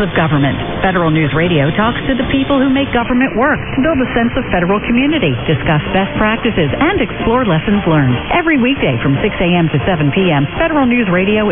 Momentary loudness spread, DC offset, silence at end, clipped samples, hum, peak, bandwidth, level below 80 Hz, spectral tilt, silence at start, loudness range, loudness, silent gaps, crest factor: 2 LU; under 0.1%; 0 s; under 0.1%; none; 0 dBFS; 3.9 kHz; -30 dBFS; -10.5 dB/octave; 0 s; 1 LU; -13 LUFS; none; 12 dB